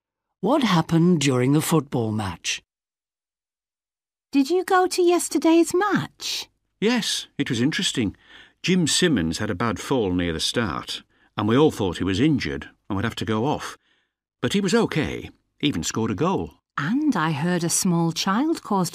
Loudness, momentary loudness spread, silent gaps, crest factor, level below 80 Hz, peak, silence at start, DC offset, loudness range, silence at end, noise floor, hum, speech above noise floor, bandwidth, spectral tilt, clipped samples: -22 LUFS; 10 LU; none; 18 dB; -52 dBFS; -6 dBFS; 0.45 s; under 0.1%; 4 LU; 0 s; under -90 dBFS; none; over 68 dB; 15.5 kHz; -4.5 dB/octave; under 0.1%